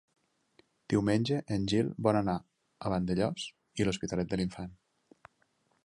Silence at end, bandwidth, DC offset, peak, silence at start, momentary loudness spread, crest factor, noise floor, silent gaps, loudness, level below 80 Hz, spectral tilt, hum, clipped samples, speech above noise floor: 1.1 s; 11.5 kHz; under 0.1%; -12 dBFS; 0.9 s; 11 LU; 20 dB; -73 dBFS; none; -32 LUFS; -56 dBFS; -6.5 dB/octave; none; under 0.1%; 43 dB